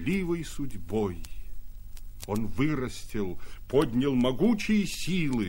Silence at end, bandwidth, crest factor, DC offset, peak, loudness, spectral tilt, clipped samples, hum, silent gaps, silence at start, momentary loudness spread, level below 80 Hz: 0 s; 16.5 kHz; 16 dB; under 0.1%; -12 dBFS; -29 LUFS; -6 dB/octave; under 0.1%; none; none; 0 s; 23 LU; -42 dBFS